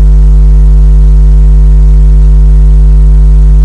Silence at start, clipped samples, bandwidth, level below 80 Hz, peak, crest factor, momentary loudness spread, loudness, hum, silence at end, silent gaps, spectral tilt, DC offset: 0 s; 0.5%; 1.5 kHz; -2 dBFS; 0 dBFS; 2 dB; 0 LU; -6 LUFS; none; 0 s; none; -9.5 dB/octave; under 0.1%